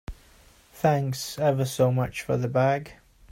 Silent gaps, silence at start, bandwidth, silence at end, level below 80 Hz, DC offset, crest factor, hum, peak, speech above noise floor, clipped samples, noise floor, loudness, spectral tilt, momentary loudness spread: none; 0.1 s; 16 kHz; 0.4 s; -50 dBFS; under 0.1%; 16 dB; none; -10 dBFS; 31 dB; under 0.1%; -55 dBFS; -25 LUFS; -6 dB/octave; 7 LU